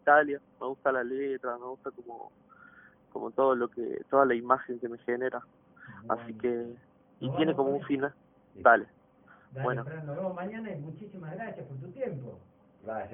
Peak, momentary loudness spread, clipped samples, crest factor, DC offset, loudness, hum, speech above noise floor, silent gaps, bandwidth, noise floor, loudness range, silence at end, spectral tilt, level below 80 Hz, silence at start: -6 dBFS; 18 LU; under 0.1%; 26 dB; under 0.1%; -31 LUFS; none; 29 dB; none; 3.7 kHz; -59 dBFS; 8 LU; 0 s; -10 dB/octave; -72 dBFS; 0.05 s